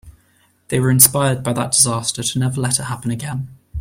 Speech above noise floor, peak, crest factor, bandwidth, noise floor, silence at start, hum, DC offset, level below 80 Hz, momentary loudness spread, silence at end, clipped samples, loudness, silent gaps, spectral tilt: 40 dB; 0 dBFS; 18 dB; 16.5 kHz; -58 dBFS; 0.05 s; none; under 0.1%; -44 dBFS; 14 LU; 0 s; under 0.1%; -16 LUFS; none; -3.5 dB/octave